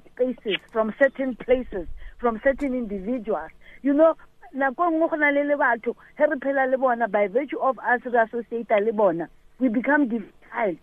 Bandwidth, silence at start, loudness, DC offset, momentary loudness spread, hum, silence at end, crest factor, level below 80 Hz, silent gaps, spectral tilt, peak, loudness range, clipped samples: 4 kHz; 0.2 s; -23 LUFS; under 0.1%; 11 LU; none; 0.05 s; 16 dB; -48 dBFS; none; -7.5 dB/octave; -6 dBFS; 3 LU; under 0.1%